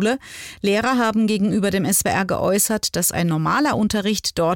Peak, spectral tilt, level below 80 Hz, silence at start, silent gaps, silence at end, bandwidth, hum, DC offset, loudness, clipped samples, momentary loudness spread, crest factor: -6 dBFS; -4 dB/octave; -48 dBFS; 0 s; none; 0 s; 17 kHz; none; under 0.1%; -19 LUFS; under 0.1%; 3 LU; 14 dB